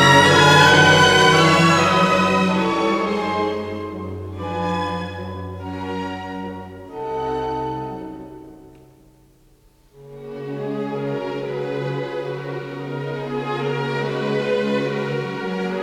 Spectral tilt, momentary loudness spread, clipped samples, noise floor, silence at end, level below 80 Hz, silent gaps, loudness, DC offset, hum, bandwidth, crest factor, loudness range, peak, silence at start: -4.5 dB/octave; 20 LU; under 0.1%; -54 dBFS; 0 s; -52 dBFS; none; -18 LUFS; under 0.1%; none; 15.5 kHz; 20 dB; 16 LU; 0 dBFS; 0 s